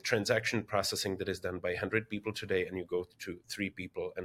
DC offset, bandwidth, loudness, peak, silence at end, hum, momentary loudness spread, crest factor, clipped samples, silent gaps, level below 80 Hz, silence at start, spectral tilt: under 0.1%; 17 kHz; -34 LUFS; -14 dBFS; 0 s; none; 9 LU; 22 dB; under 0.1%; none; -64 dBFS; 0.05 s; -4 dB/octave